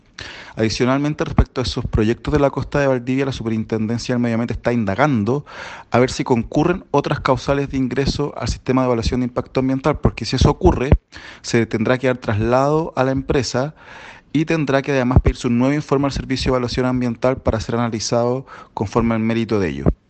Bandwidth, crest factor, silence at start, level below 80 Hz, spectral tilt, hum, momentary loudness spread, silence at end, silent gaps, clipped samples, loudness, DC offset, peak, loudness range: 8.8 kHz; 18 dB; 0.2 s; -30 dBFS; -6.5 dB/octave; none; 6 LU; 0.15 s; none; under 0.1%; -19 LUFS; under 0.1%; 0 dBFS; 2 LU